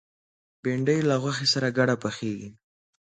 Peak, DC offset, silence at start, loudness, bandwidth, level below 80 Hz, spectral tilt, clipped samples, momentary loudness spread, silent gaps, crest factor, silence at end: -8 dBFS; under 0.1%; 0.65 s; -25 LUFS; 9.4 kHz; -66 dBFS; -5 dB/octave; under 0.1%; 11 LU; none; 20 dB; 0.55 s